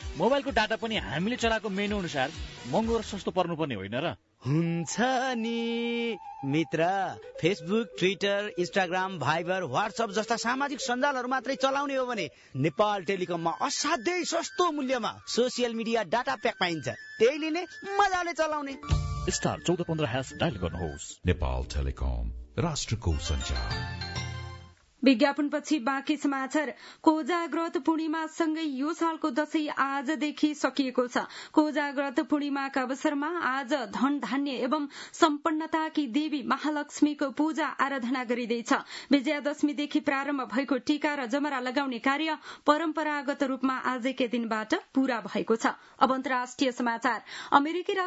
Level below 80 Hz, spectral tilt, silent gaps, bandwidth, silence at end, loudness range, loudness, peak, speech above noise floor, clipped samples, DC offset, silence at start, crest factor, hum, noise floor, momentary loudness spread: -46 dBFS; -5 dB/octave; none; 8 kHz; 0 s; 2 LU; -29 LUFS; -6 dBFS; 21 dB; under 0.1%; under 0.1%; 0 s; 22 dB; none; -49 dBFS; 6 LU